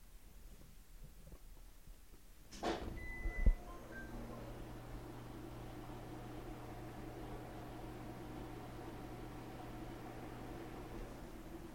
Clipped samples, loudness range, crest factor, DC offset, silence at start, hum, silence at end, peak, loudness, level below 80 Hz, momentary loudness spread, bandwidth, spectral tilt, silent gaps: under 0.1%; 6 LU; 26 dB; under 0.1%; 0 s; none; 0 s; -20 dBFS; -48 LUFS; -48 dBFS; 18 LU; 16.5 kHz; -6 dB/octave; none